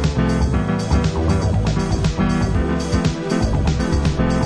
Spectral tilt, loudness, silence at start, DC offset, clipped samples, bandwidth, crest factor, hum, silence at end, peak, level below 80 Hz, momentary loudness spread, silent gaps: -6.5 dB/octave; -19 LUFS; 0 s; under 0.1%; under 0.1%; 11 kHz; 14 dB; none; 0 s; -4 dBFS; -24 dBFS; 2 LU; none